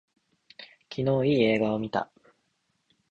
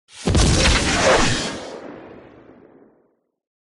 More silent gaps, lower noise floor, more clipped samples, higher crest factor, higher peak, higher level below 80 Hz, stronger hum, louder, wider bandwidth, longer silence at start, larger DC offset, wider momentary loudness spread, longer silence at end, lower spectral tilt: neither; first, -74 dBFS vs -64 dBFS; neither; about the same, 20 dB vs 16 dB; second, -10 dBFS vs -6 dBFS; second, -62 dBFS vs -28 dBFS; neither; second, -26 LUFS vs -17 LUFS; second, 7.6 kHz vs 11.5 kHz; first, 0.6 s vs 0.15 s; neither; first, 24 LU vs 21 LU; second, 1.1 s vs 1.45 s; first, -8 dB/octave vs -3.5 dB/octave